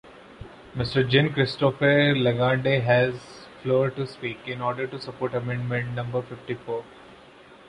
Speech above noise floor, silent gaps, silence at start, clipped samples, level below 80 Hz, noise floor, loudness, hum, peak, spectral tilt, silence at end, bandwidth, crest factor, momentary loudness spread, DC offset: 25 dB; none; 0.05 s; under 0.1%; -54 dBFS; -49 dBFS; -24 LUFS; none; -6 dBFS; -7.5 dB/octave; 0.15 s; 10.5 kHz; 20 dB; 15 LU; under 0.1%